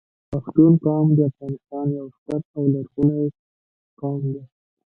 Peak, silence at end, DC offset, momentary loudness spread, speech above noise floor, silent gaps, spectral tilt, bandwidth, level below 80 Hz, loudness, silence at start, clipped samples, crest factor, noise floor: -2 dBFS; 0.5 s; under 0.1%; 16 LU; over 70 dB; 2.18-2.26 s, 2.45-2.54 s, 3.39-3.97 s; -13 dB/octave; 1.8 kHz; -56 dBFS; -21 LUFS; 0.3 s; under 0.1%; 18 dB; under -90 dBFS